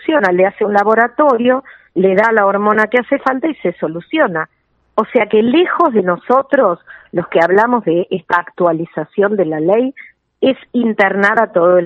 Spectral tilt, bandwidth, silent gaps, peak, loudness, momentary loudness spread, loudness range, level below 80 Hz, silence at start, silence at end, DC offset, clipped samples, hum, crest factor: -7.5 dB/octave; 7.8 kHz; none; 0 dBFS; -14 LUFS; 8 LU; 2 LU; -62 dBFS; 0.05 s; 0 s; under 0.1%; under 0.1%; none; 14 dB